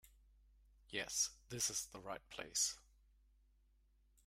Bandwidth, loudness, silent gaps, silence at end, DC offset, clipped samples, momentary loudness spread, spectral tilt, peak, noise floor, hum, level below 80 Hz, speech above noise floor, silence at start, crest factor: 16 kHz; -41 LUFS; none; 1.45 s; under 0.1%; under 0.1%; 11 LU; -0.5 dB/octave; -24 dBFS; -73 dBFS; none; -70 dBFS; 30 dB; 0.05 s; 22 dB